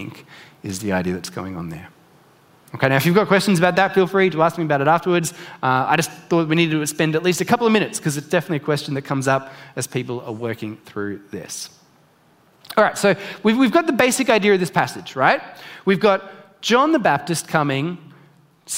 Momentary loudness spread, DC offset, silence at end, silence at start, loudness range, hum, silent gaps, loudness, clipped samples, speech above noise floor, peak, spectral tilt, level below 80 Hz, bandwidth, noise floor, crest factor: 14 LU; under 0.1%; 0 s; 0 s; 7 LU; none; none; -19 LUFS; under 0.1%; 36 dB; 0 dBFS; -5 dB/octave; -62 dBFS; 16 kHz; -56 dBFS; 20 dB